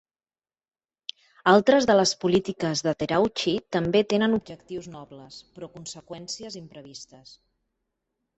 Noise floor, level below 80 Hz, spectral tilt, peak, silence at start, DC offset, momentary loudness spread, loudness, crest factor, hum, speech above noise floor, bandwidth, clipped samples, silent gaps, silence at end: under -90 dBFS; -60 dBFS; -4.5 dB/octave; -4 dBFS; 1.45 s; under 0.1%; 24 LU; -23 LUFS; 22 dB; none; over 65 dB; 8.2 kHz; under 0.1%; none; 1.35 s